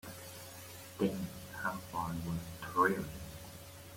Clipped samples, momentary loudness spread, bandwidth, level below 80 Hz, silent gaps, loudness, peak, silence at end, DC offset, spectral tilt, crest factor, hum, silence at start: under 0.1%; 17 LU; 16.5 kHz; -60 dBFS; none; -38 LUFS; -16 dBFS; 0 s; under 0.1%; -5.5 dB/octave; 22 dB; none; 0.05 s